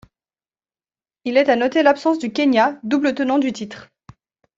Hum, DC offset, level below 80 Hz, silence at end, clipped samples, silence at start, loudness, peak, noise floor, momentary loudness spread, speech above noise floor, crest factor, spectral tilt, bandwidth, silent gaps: none; under 0.1%; -64 dBFS; 0.75 s; under 0.1%; 1.25 s; -18 LUFS; -2 dBFS; under -90 dBFS; 15 LU; over 72 dB; 18 dB; -5 dB/octave; 7.8 kHz; none